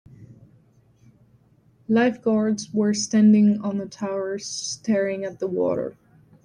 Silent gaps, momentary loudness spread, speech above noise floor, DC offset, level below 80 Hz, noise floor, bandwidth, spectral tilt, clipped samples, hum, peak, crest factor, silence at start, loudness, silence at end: none; 12 LU; 37 dB; under 0.1%; -66 dBFS; -58 dBFS; 10 kHz; -5.5 dB/octave; under 0.1%; none; -8 dBFS; 16 dB; 0.2 s; -22 LUFS; 0.55 s